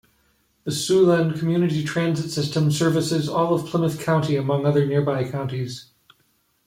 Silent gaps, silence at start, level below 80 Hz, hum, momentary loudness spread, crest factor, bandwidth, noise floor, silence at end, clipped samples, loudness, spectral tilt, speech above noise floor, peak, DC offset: none; 0.65 s; -58 dBFS; none; 10 LU; 14 dB; 16 kHz; -65 dBFS; 0.85 s; under 0.1%; -22 LUFS; -6 dB/octave; 45 dB; -8 dBFS; under 0.1%